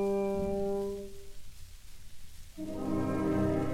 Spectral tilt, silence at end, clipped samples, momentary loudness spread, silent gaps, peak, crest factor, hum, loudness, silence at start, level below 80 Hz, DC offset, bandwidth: -7.5 dB/octave; 0 s; under 0.1%; 24 LU; none; -18 dBFS; 16 dB; none; -33 LUFS; 0 s; -48 dBFS; under 0.1%; 16.5 kHz